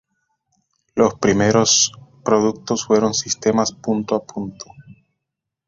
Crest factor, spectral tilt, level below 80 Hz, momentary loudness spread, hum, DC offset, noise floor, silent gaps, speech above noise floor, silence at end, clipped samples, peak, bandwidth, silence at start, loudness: 18 dB; -3.5 dB/octave; -52 dBFS; 16 LU; none; under 0.1%; -81 dBFS; none; 63 dB; 0.85 s; under 0.1%; -2 dBFS; 7.6 kHz; 0.95 s; -18 LUFS